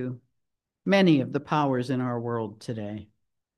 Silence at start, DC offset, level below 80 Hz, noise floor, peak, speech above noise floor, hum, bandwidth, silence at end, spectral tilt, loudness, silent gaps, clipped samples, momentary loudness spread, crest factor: 0 s; under 0.1%; -72 dBFS; -81 dBFS; -10 dBFS; 56 dB; none; 11.5 kHz; 0.55 s; -7.5 dB/octave; -26 LUFS; none; under 0.1%; 16 LU; 18 dB